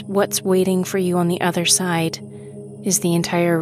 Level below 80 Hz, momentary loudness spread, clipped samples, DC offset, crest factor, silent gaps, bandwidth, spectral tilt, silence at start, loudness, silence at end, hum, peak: -60 dBFS; 15 LU; under 0.1%; under 0.1%; 18 dB; none; 16 kHz; -4 dB/octave; 0 s; -19 LUFS; 0 s; none; -2 dBFS